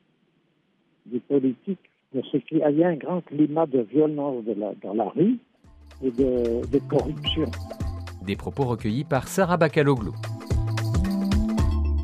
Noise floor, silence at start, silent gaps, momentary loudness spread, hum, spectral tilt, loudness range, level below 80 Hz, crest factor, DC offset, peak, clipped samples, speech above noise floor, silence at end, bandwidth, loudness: -67 dBFS; 1.05 s; none; 12 LU; none; -7 dB/octave; 3 LU; -36 dBFS; 18 dB; under 0.1%; -6 dBFS; under 0.1%; 43 dB; 0 s; 14.5 kHz; -25 LUFS